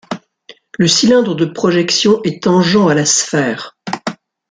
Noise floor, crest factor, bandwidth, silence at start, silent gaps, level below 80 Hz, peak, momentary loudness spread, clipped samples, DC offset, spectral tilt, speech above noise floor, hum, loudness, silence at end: -43 dBFS; 14 dB; 9.8 kHz; 0.1 s; none; -54 dBFS; 0 dBFS; 14 LU; under 0.1%; under 0.1%; -4 dB/octave; 31 dB; none; -13 LUFS; 0.35 s